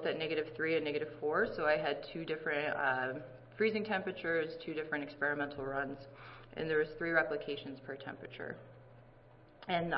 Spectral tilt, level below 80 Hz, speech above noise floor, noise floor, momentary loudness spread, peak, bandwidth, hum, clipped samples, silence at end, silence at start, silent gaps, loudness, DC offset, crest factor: -3 dB/octave; -66 dBFS; 24 dB; -60 dBFS; 14 LU; -16 dBFS; 5.6 kHz; none; under 0.1%; 0 s; 0 s; none; -36 LUFS; under 0.1%; 20 dB